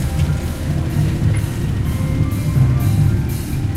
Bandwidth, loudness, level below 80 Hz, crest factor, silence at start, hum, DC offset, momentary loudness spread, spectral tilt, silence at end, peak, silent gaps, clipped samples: 16 kHz; -18 LUFS; -26 dBFS; 12 dB; 0 s; none; under 0.1%; 6 LU; -7 dB/octave; 0 s; -4 dBFS; none; under 0.1%